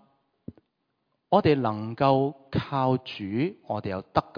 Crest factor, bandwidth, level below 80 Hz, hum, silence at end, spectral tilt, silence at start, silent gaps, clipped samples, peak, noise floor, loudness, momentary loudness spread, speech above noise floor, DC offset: 22 dB; 5.2 kHz; -56 dBFS; none; 0.15 s; -9 dB/octave; 0.5 s; none; under 0.1%; -6 dBFS; -77 dBFS; -26 LUFS; 9 LU; 51 dB; under 0.1%